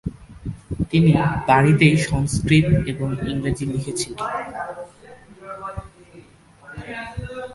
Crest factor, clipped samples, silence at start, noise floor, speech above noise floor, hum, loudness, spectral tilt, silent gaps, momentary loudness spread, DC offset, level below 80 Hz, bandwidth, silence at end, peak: 20 dB; under 0.1%; 0.05 s; -48 dBFS; 29 dB; none; -20 LUFS; -6 dB/octave; none; 20 LU; under 0.1%; -38 dBFS; 11.5 kHz; 0 s; -2 dBFS